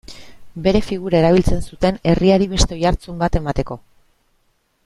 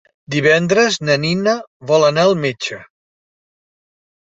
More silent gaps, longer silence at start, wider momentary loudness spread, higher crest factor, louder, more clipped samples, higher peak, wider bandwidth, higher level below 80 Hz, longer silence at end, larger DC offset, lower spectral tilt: second, none vs 1.67-1.80 s; second, 0.1 s vs 0.3 s; about the same, 10 LU vs 11 LU; about the same, 18 dB vs 16 dB; second, -18 LUFS vs -15 LUFS; neither; about the same, 0 dBFS vs -2 dBFS; first, 12 kHz vs 8 kHz; first, -28 dBFS vs -58 dBFS; second, 1.1 s vs 1.4 s; neither; first, -6 dB/octave vs -4.5 dB/octave